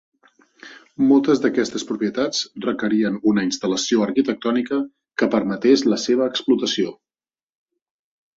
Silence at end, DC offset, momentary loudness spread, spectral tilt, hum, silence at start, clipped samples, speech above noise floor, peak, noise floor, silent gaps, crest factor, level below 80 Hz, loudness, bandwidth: 1.45 s; under 0.1%; 8 LU; -4.5 dB/octave; none; 0.65 s; under 0.1%; over 71 dB; -4 dBFS; under -90 dBFS; none; 18 dB; -64 dBFS; -20 LUFS; 7.8 kHz